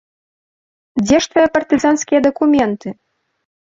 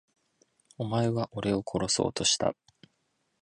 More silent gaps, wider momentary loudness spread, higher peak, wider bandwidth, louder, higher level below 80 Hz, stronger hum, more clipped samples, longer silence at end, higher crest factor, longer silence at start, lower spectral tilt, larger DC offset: neither; first, 11 LU vs 7 LU; first, -2 dBFS vs -12 dBFS; second, 7.8 kHz vs 11.5 kHz; first, -15 LUFS vs -29 LUFS; first, -50 dBFS vs -58 dBFS; neither; neither; second, 0.75 s vs 0.9 s; second, 14 dB vs 20 dB; first, 0.95 s vs 0.8 s; about the same, -4.5 dB/octave vs -4 dB/octave; neither